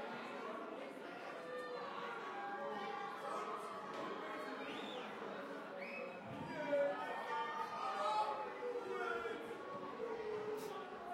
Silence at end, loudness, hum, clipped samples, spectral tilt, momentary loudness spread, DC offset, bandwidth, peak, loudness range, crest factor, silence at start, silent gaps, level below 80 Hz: 0 s; -45 LUFS; none; under 0.1%; -4.5 dB/octave; 9 LU; under 0.1%; 16 kHz; -26 dBFS; 5 LU; 18 dB; 0 s; none; -86 dBFS